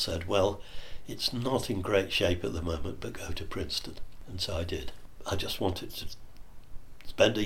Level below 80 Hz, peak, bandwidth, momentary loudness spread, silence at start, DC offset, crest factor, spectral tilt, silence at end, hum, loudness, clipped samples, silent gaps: -44 dBFS; -10 dBFS; 16.5 kHz; 18 LU; 0 s; under 0.1%; 22 dB; -4.5 dB/octave; 0 s; none; -32 LUFS; under 0.1%; none